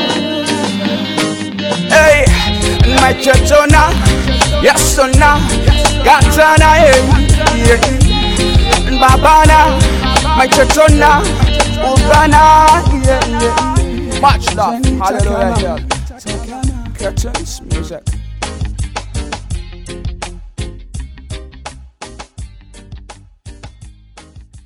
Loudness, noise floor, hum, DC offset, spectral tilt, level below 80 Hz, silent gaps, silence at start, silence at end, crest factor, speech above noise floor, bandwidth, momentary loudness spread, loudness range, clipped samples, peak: -10 LUFS; -38 dBFS; none; under 0.1%; -4.5 dB/octave; -18 dBFS; none; 0 s; 0.1 s; 10 dB; 29 dB; 17 kHz; 19 LU; 16 LU; 0.6%; 0 dBFS